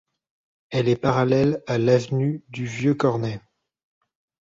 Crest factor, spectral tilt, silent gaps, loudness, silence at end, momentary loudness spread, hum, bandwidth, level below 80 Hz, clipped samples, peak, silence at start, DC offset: 18 dB; -7.5 dB/octave; none; -22 LUFS; 1.05 s; 11 LU; none; 7.8 kHz; -56 dBFS; under 0.1%; -4 dBFS; 0.7 s; under 0.1%